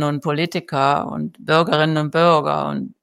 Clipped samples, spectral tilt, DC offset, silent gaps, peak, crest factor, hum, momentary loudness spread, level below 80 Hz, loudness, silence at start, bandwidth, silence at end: under 0.1%; -6.5 dB/octave; under 0.1%; none; -2 dBFS; 16 dB; none; 9 LU; -62 dBFS; -19 LUFS; 0 s; 12.5 kHz; 0.15 s